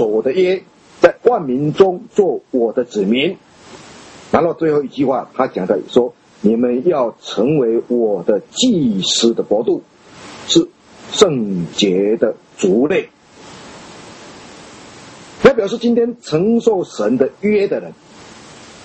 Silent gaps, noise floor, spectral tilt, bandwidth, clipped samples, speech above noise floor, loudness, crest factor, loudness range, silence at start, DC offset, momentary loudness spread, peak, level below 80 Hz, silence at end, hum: none; -39 dBFS; -5 dB/octave; 8.6 kHz; under 0.1%; 24 dB; -16 LUFS; 16 dB; 3 LU; 0 s; under 0.1%; 22 LU; 0 dBFS; -52 dBFS; 0.2 s; none